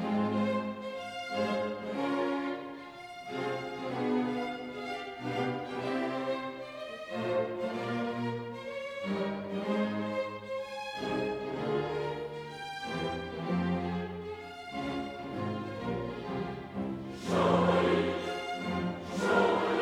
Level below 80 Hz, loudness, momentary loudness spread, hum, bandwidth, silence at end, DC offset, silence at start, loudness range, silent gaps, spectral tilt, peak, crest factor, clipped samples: -62 dBFS; -34 LUFS; 11 LU; none; 13.5 kHz; 0 s; under 0.1%; 0 s; 5 LU; none; -6.5 dB/octave; -14 dBFS; 20 dB; under 0.1%